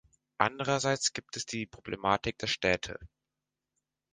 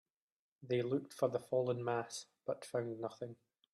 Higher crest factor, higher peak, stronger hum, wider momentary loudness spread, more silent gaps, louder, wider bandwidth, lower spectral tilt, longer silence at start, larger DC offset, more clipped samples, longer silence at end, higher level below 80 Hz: first, 26 dB vs 18 dB; first, -6 dBFS vs -22 dBFS; neither; about the same, 10 LU vs 9 LU; neither; first, -31 LUFS vs -39 LUFS; second, 10 kHz vs 14 kHz; second, -3 dB/octave vs -6 dB/octave; second, 0.4 s vs 0.6 s; neither; neither; first, 1.05 s vs 0.4 s; first, -58 dBFS vs -84 dBFS